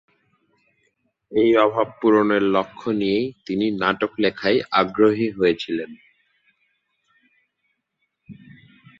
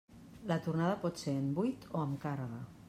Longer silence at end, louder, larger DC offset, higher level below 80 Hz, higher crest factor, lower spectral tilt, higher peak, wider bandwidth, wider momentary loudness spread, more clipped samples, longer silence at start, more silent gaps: first, 0.65 s vs 0 s; first, -20 LUFS vs -37 LUFS; neither; first, -60 dBFS vs -68 dBFS; about the same, 20 dB vs 18 dB; about the same, -7 dB/octave vs -7 dB/octave; first, -4 dBFS vs -20 dBFS; second, 7.4 kHz vs 14.5 kHz; about the same, 9 LU vs 9 LU; neither; first, 1.3 s vs 0.1 s; neither